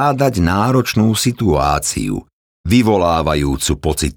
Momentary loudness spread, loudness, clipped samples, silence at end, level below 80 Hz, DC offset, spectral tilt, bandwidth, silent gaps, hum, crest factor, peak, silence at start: 6 LU; -15 LUFS; under 0.1%; 0.05 s; -30 dBFS; under 0.1%; -5 dB/octave; 19.5 kHz; 2.33-2.64 s; none; 14 dB; -2 dBFS; 0 s